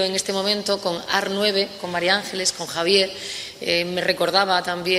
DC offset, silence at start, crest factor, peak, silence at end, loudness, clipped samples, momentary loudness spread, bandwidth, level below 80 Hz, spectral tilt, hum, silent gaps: under 0.1%; 0 s; 20 dB; -2 dBFS; 0 s; -21 LUFS; under 0.1%; 6 LU; 16 kHz; -60 dBFS; -2.5 dB/octave; none; none